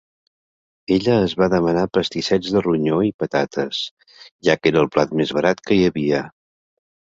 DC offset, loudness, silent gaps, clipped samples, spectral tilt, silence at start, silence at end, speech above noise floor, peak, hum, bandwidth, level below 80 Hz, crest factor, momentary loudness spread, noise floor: under 0.1%; -19 LUFS; 3.14-3.19 s, 3.91-3.97 s, 4.31-4.39 s; under 0.1%; -6 dB/octave; 0.9 s; 0.9 s; over 71 dB; -2 dBFS; none; 7.8 kHz; -50 dBFS; 18 dB; 7 LU; under -90 dBFS